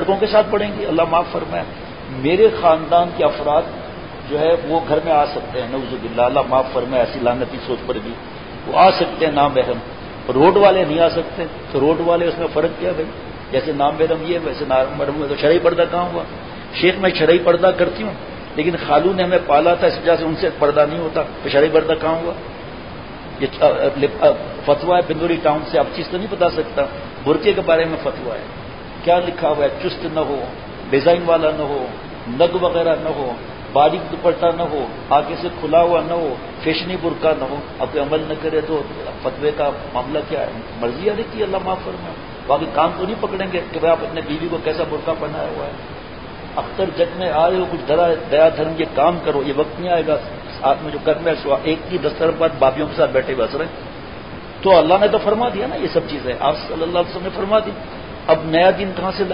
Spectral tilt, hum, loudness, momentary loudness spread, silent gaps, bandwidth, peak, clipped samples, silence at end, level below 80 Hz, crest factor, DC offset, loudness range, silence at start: -11 dB/octave; none; -18 LUFS; 13 LU; none; 5.4 kHz; -2 dBFS; under 0.1%; 0 s; -42 dBFS; 16 dB; 0.7%; 5 LU; 0 s